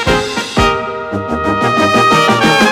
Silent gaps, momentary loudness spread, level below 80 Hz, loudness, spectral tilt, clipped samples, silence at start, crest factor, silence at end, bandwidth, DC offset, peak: none; 9 LU; -30 dBFS; -12 LUFS; -4.5 dB/octave; under 0.1%; 0 s; 12 dB; 0 s; 17 kHz; under 0.1%; 0 dBFS